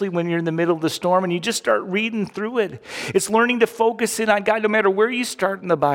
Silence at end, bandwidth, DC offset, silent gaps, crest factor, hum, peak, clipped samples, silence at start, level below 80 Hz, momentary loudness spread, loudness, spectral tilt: 0 s; 17 kHz; under 0.1%; none; 16 dB; none; -4 dBFS; under 0.1%; 0 s; -64 dBFS; 6 LU; -20 LUFS; -4.5 dB/octave